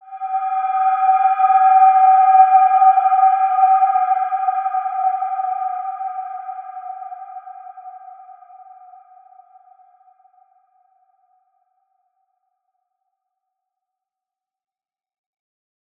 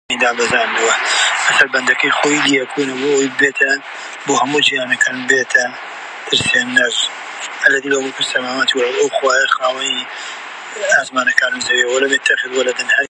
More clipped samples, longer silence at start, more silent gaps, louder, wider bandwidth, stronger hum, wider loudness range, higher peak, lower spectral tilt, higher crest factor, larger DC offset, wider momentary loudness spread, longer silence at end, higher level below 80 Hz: neither; about the same, 0.1 s vs 0.1 s; neither; about the same, -15 LUFS vs -14 LUFS; second, 3.5 kHz vs 11.5 kHz; neither; first, 22 LU vs 2 LU; about the same, -2 dBFS vs 0 dBFS; about the same, -1.5 dB/octave vs -1.5 dB/octave; about the same, 18 dB vs 16 dB; neither; first, 22 LU vs 10 LU; first, 7.65 s vs 0 s; second, under -90 dBFS vs -60 dBFS